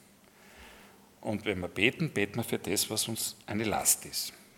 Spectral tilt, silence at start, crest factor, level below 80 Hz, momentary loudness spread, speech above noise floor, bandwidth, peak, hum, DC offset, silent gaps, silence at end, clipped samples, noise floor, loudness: -3 dB/octave; 0.45 s; 26 dB; -66 dBFS; 9 LU; 27 dB; 18 kHz; -8 dBFS; none; under 0.1%; none; 0.15 s; under 0.1%; -58 dBFS; -30 LUFS